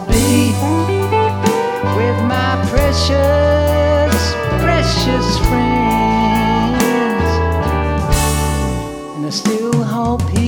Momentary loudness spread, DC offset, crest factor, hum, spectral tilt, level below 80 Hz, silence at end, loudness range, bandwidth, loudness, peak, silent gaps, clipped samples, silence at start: 4 LU; under 0.1%; 14 dB; none; -5.5 dB/octave; -24 dBFS; 0 s; 2 LU; 20 kHz; -15 LUFS; 0 dBFS; none; under 0.1%; 0 s